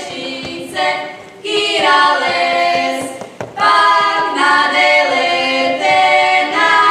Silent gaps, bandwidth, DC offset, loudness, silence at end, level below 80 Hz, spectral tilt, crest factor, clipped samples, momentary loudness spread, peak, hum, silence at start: none; 14 kHz; under 0.1%; -12 LUFS; 0 s; -60 dBFS; -2 dB/octave; 12 dB; under 0.1%; 13 LU; 0 dBFS; none; 0 s